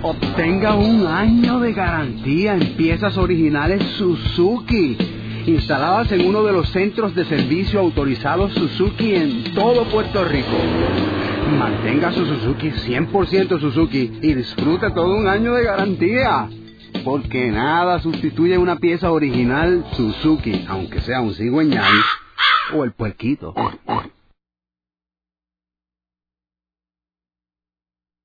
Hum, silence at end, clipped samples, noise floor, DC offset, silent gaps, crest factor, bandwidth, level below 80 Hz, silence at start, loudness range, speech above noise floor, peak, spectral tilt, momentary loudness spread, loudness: none; 4.15 s; under 0.1%; under -90 dBFS; under 0.1%; none; 18 dB; 5 kHz; -34 dBFS; 0 s; 2 LU; over 73 dB; 0 dBFS; -8 dB/octave; 7 LU; -18 LUFS